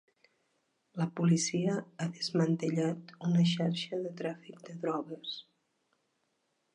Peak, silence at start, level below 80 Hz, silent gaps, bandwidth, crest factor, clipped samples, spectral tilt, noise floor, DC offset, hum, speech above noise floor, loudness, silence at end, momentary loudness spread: -16 dBFS; 0.95 s; -80 dBFS; none; 10.5 kHz; 18 dB; under 0.1%; -5.5 dB/octave; -79 dBFS; under 0.1%; none; 47 dB; -33 LUFS; 1.35 s; 13 LU